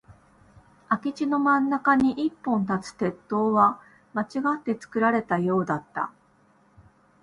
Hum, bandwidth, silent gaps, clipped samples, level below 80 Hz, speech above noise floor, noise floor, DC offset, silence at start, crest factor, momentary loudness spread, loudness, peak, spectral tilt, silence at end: none; 11 kHz; none; under 0.1%; -62 dBFS; 37 dB; -61 dBFS; under 0.1%; 0.1 s; 20 dB; 10 LU; -25 LUFS; -6 dBFS; -7 dB/octave; 1.1 s